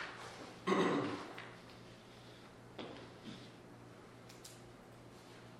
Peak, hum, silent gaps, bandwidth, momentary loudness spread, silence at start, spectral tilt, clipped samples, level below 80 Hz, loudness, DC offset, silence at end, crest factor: -20 dBFS; none; none; 15.5 kHz; 21 LU; 0 s; -5.5 dB/octave; under 0.1%; -74 dBFS; -42 LUFS; under 0.1%; 0 s; 24 dB